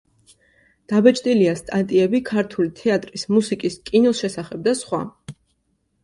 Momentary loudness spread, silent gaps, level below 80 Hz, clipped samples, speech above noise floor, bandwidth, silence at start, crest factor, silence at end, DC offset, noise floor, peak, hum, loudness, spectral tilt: 9 LU; none; -58 dBFS; under 0.1%; 49 dB; 11.5 kHz; 0.9 s; 20 dB; 0.7 s; under 0.1%; -69 dBFS; -2 dBFS; none; -20 LUFS; -5.5 dB/octave